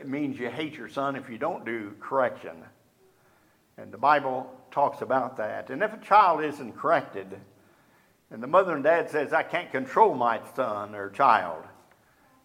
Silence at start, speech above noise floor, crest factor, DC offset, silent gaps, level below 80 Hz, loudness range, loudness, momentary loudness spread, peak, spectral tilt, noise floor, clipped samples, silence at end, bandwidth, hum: 0 s; 37 dB; 22 dB; under 0.1%; none; -76 dBFS; 7 LU; -26 LUFS; 15 LU; -6 dBFS; -6 dB/octave; -63 dBFS; under 0.1%; 0.75 s; 15.5 kHz; none